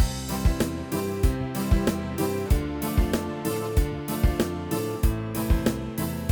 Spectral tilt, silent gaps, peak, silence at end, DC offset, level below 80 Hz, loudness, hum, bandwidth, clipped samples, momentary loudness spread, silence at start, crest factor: -6 dB/octave; none; -8 dBFS; 0 s; under 0.1%; -28 dBFS; -27 LUFS; none; over 20 kHz; under 0.1%; 4 LU; 0 s; 16 dB